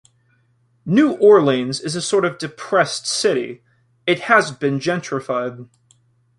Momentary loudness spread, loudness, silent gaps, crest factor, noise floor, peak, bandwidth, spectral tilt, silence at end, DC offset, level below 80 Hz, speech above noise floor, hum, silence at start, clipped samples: 12 LU; -18 LUFS; none; 18 dB; -61 dBFS; -2 dBFS; 11.5 kHz; -4.5 dB/octave; 0.75 s; under 0.1%; -64 dBFS; 43 dB; none; 0.85 s; under 0.1%